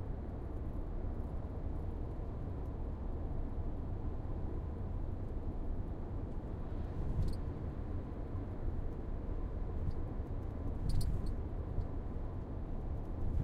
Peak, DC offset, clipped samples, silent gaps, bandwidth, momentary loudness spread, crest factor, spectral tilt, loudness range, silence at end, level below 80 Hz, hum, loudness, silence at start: -22 dBFS; under 0.1%; under 0.1%; none; 10.5 kHz; 4 LU; 16 dB; -9 dB/octave; 2 LU; 0 s; -40 dBFS; none; -43 LUFS; 0 s